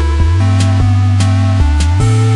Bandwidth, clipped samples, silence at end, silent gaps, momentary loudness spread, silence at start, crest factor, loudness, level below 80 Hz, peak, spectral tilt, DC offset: 11.5 kHz; under 0.1%; 0 s; none; 1 LU; 0 s; 8 dB; -11 LUFS; -18 dBFS; 0 dBFS; -6.5 dB/octave; under 0.1%